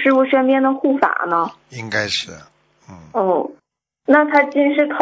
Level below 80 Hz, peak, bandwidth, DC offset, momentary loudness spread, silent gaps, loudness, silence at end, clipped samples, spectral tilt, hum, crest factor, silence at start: -60 dBFS; 0 dBFS; 7.8 kHz; under 0.1%; 13 LU; none; -17 LUFS; 0 s; under 0.1%; -4.5 dB/octave; none; 18 dB; 0 s